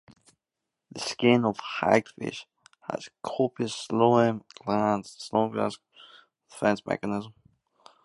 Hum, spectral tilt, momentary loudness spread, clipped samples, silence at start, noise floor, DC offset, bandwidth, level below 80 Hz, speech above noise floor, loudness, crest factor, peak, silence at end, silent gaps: none; -5.5 dB/octave; 14 LU; under 0.1%; 0.95 s; -86 dBFS; under 0.1%; 11.5 kHz; -66 dBFS; 60 dB; -27 LUFS; 24 dB; -4 dBFS; 0.75 s; none